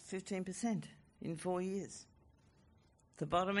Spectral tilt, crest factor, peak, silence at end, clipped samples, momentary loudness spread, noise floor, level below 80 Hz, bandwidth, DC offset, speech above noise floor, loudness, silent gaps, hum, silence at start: -5 dB/octave; 22 dB; -20 dBFS; 0 s; under 0.1%; 13 LU; -69 dBFS; -68 dBFS; 11.5 kHz; under 0.1%; 30 dB; -41 LUFS; none; none; 0 s